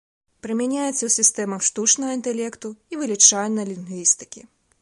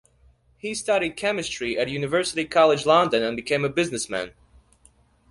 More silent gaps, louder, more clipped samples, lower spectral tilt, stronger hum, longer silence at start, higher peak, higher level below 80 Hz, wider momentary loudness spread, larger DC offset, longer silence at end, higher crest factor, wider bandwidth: neither; first, -19 LUFS vs -23 LUFS; neither; second, -2 dB/octave vs -4 dB/octave; neither; second, 0.45 s vs 0.65 s; about the same, -2 dBFS vs -4 dBFS; second, -68 dBFS vs -56 dBFS; first, 17 LU vs 11 LU; neither; second, 0.4 s vs 1 s; about the same, 22 dB vs 20 dB; about the same, 11.5 kHz vs 11.5 kHz